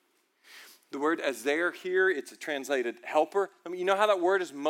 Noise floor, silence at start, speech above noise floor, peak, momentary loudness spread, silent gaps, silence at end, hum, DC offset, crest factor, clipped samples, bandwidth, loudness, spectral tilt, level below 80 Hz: -64 dBFS; 0.5 s; 36 dB; -12 dBFS; 10 LU; none; 0 s; none; under 0.1%; 18 dB; under 0.1%; 16.5 kHz; -29 LUFS; -3 dB/octave; under -90 dBFS